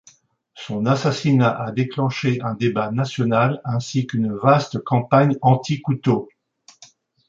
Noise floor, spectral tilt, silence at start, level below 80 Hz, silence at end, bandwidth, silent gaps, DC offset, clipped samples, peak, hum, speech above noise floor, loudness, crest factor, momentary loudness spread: -54 dBFS; -7 dB/octave; 0.55 s; -58 dBFS; 1.05 s; 7.6 kHz; none; under 0.1%; under 0.1%; -2 dBFS; none; 35 dB; -20 LUFS; 18 dB; 7 LU